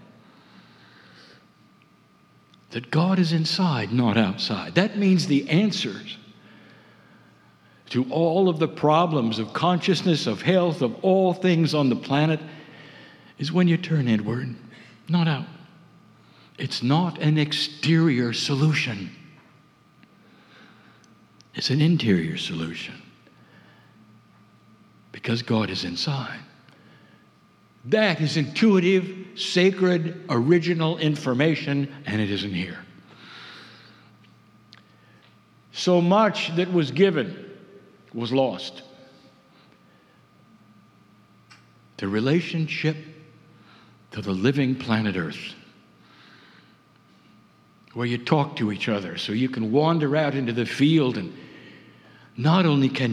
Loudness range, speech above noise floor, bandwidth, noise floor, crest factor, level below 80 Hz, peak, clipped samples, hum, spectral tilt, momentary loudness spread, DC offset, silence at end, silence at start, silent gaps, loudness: 9 LU; 35 dB; 11 kHz; -57 dBFS; 24 dB; -70 dBFS; -2 dBFS; under 0.1%; none; -6.5 dB/octave; 17 LU; under 0.1%; 0 s; 2.7 s; none; -23 LUFS